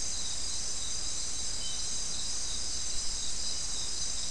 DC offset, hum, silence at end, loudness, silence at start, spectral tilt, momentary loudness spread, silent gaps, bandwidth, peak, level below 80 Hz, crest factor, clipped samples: 2%; none; 0 s; -33 LUFS; 0 s; 0 dB/octave; 1 LU; none; 12 kHz; -20 dBFS; -48 dBFS; 14 dB; under 0.1%